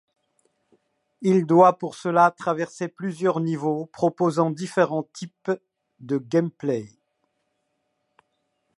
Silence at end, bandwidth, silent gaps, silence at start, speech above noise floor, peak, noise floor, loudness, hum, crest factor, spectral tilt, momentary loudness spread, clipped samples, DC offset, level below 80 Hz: 1.9 s; 11.5 kHz; none; 1.2 s; 52 dB; -2 dBFS; -75 dBFS; -23 LUFS; none; 22 dB; -7 dB/octave; 12 LU; under 0.1%; under 0.1%; -74 dBFS